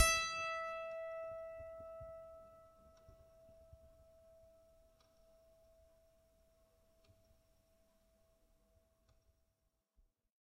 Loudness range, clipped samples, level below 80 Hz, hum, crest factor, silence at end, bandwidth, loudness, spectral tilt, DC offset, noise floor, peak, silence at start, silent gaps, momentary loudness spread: 22 LU; under 0.1%; -64 dBFS; none; 30 dB; 6.1 s; 15.5 kHz; -42 LUFS; -0.5 dB/octave; under 0.1%; -84 dBFS; -16 dBFS; 0 s; none; 26 LU